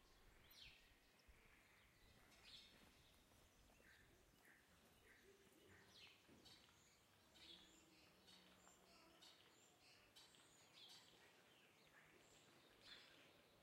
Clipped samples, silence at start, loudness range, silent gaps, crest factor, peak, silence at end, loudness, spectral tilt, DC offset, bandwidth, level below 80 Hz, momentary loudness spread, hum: under 0.1%; 0 s; 2 LU; none; 20 dB; -50 dBFS; 0 s; -66 LUFS; -2 dB/octave; under 0.1%; 16 kHz; -84 dBFS; 5 LU; none